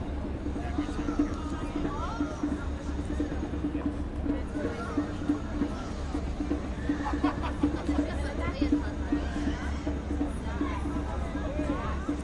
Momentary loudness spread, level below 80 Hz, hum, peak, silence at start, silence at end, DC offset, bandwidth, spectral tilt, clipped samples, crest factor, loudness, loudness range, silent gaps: 4 LU; -36 dBFS; none; -14 dBFS; 0 s; 0 s; under 0.1%; 11 kHz; -7 dB/octave; under 0.1%; 18 dB; -32 LUFS; 2 LU; none